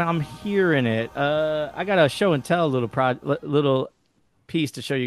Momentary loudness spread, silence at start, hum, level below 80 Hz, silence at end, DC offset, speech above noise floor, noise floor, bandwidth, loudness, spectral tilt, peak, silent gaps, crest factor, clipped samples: 7 LU; 0 s; none; -58 dBFS; 0 s; under 0.1%; 44 dB; -66 dBFS; 12.5 kHz; -23 LUFS; -6.5 dB/octave; -6 dBFS; none; 16 dB; under 0.1%